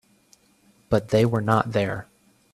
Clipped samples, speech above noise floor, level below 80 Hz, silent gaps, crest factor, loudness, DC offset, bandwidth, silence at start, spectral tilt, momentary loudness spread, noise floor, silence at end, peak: under 0.1%; 38 dB; -52 dBFS; none; 22 dB; -23 LUFS; under 0.1%; 13.5 kHz; 0.9 s; -7 dB/octave; 7 LU; -60 dBFS; 0.5 s; -4 dBFS